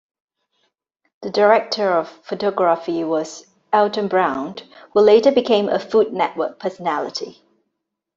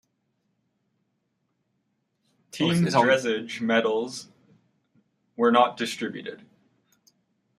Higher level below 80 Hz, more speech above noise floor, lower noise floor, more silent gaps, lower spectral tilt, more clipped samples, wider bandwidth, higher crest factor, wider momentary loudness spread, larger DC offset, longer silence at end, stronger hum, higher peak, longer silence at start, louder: first, -66 dBFS vs -72 dBFS; first, 60 dB vs 52 dB; about the same, -77 dBFS vs -75 dBFS; neither; about the same, -5 dB/octave vs -5 dB/octave; neither; second, 7.6 kHz vs 14 kHz; about the same, 18 dB vs 22 dB; second, 16 LU vs 19 LU; neither; second, 0.85 s vs 1.25 s; neither; first, -2 dBFS vs -6 dBFS; second, 1.2 s vs 2.55 s; first, -18 LUFS vs -24 LUFS